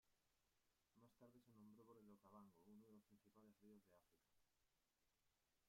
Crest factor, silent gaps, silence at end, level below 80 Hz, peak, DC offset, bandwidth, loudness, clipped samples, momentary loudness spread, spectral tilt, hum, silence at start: 18 dB; none; 0 s; under -90 dBFS; -56 dBFS; under 0.1%; 15 kHz; -69 LUFS; under 0.1%; 1 LU; -6.5 dB/octave; none; 0.05 s